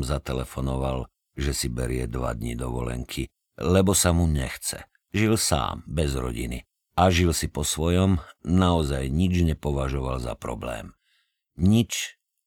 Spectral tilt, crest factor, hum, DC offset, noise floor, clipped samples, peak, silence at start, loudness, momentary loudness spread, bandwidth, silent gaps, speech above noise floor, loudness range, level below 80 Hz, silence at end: -5 dB/octave; 20 dB; none; under 0.1%; -70 dBFS; under 0.1%; -6 dBFS; 0 s; -25 LUFS; 12 LU; 18 kHz; none; 46 dB; 4 LU; -34 dBFS; 0.35 s